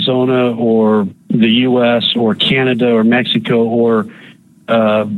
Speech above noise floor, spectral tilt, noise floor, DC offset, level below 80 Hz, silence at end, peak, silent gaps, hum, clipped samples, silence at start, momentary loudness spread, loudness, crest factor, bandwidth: 23 dB; -7.5 dB/octave; -35 dBFS; under 0.1%; -56 dBFS; 0 s; -2 dBFS; none; none; under 0.1%; 0 s; 4 LU; -13 LUFS; 12 dB; 4.4 kHz